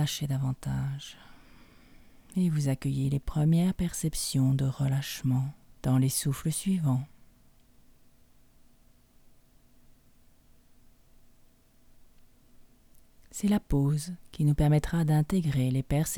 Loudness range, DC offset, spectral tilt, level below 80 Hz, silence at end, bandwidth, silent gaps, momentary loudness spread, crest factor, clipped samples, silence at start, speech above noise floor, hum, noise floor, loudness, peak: 7 LU; under 0.1%; -6 dB/octave; -46 dBFS; 0 s; 19 kHz; none; 8 LU; 18 dB; under 0.1%; 0 s; 32 dB; none; -59 dBFS; -29 LUFS; -12 dBFS